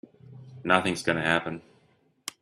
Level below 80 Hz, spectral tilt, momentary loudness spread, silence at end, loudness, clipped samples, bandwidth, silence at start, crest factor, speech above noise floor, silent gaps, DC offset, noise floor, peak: -64 dBFS; -4.5 dB/octave; 17 LU; 0.1 s; -26 LUFS; under 0.1%; 13.5 kHz; 0.3 s; 26 dB; 39 dB; none; under 0.1%; -65 dBFS; -2 dBFS